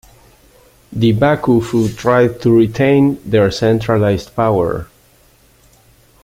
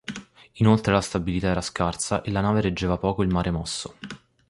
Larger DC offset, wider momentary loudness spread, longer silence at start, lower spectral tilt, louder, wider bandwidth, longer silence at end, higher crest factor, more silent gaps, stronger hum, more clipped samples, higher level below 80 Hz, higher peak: neither; second, 5 LU vs 16 LU; first, 0.9 s vs 0.1 s; first, -7.5 dB/octave vs -5.5 dB/octave; first, -14 LUFS vs -24 LUFS; first, 16 kHz vs 11.5 kHz; first, 1.4 s vs 0.35 s; second, 14 dB vs 20 dB; neither; neither; neither; about the same, -42 dBFS vs -40 dBFS; first, 0 dBFS vs -4 dBFS